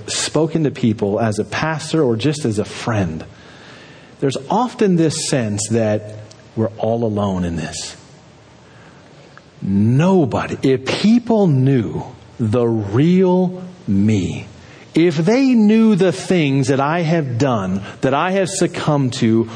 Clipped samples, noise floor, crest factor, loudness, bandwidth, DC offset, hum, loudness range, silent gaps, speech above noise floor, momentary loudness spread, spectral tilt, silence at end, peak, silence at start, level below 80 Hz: under 0.1%; -44 dBFS; 14 dB; -17 LUFS; 10.5 kHz; under 0.1%; none; 6 LU; none; 28 dB; 10 LU; -6 dB/octave; 0 s; -4 dBFS; 0 s; -50 dBFS